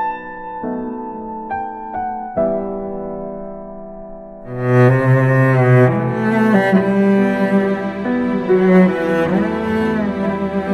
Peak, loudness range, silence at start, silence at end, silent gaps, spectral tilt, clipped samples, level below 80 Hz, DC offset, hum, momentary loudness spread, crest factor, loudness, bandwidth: 0 dBFS; 10 LU; 0 s; 0 s; none; -9 dB/octave; under 0.1%; -46 dBFS; under 0.1%; none; 17 LU; 16 dB; -16 LUFS; 8.2 kHz